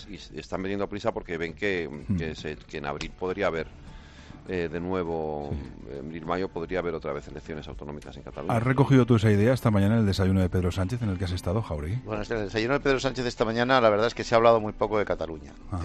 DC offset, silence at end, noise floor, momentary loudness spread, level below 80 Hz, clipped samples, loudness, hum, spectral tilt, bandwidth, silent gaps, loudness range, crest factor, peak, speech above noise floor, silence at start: under 0.1%; 0 s; -46 dBFS; 17 LU; -46 dBFS; under 0.1%; -27 LUFS; none; -7 dB/octave; 13.5 kHz; none; 9 LU; 20 dB; -6 dBFS; 20 dB; 0 s